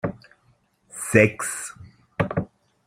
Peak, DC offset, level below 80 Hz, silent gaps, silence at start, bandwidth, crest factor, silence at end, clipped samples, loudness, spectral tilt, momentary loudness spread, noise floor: -2 dBFS; under 0.1%; -54 dBFS; none; 0.05 s; 15.5 kHz; 24 dB; 0.4 s; under 0.1%; -23 LUFS; -5.5 dB/octave; 20 LU; -63 dBFS